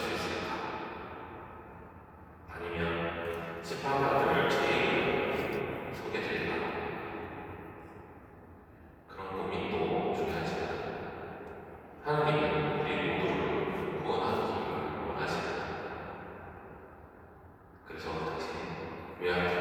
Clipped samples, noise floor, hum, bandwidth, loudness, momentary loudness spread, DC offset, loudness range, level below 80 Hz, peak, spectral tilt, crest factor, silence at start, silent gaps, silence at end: under 0.1%; -54 dBFS; none; 18.5 kHz; -33 LUFS; 22 LU; under 0.1%; 9 LU; -58 dBFS; -14 dBFS; -6 dB/octave; 20 dB; 0 s; none; 0 s